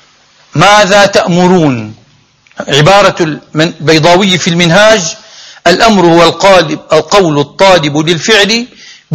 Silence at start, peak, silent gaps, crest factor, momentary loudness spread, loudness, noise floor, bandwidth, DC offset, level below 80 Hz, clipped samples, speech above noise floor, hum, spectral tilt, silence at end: 0.55 s; 0 dBFS; none; 8 dB; 9 LU; -6 LUFS; -45 dBFS; 16 kHz; under 0.1%; -40 dBFS; 4%; 39 dB; none; -4 dB/octave; 0 s